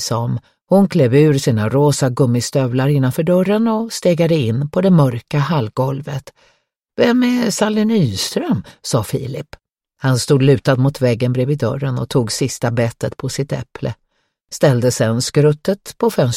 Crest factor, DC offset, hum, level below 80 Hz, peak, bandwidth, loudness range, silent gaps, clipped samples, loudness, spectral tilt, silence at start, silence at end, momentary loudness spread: 16 dB; under 0.1%; none; -50 dBFS; 0 dBFS; 16 kHz; 4 LU; none; under 0.1%; -16 LUFS; -6 dB/octave; 0 s; 0 s; 11 LU